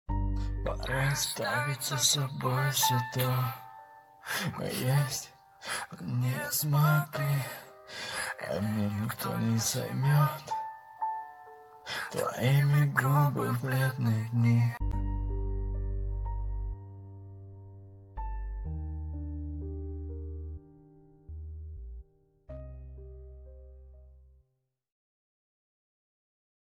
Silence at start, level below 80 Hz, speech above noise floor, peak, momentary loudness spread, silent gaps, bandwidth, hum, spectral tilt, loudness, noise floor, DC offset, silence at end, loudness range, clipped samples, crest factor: 0.1 s; -42 dBFS; 50 dB; -10 dBFS; 22 LU; none; 17.5 kHz; none; -4.5 dB/octave; -31 LUFS; -79 dBFS; under 0.1%; 2.55 s; 18 LU; under 0.1%; 22 dB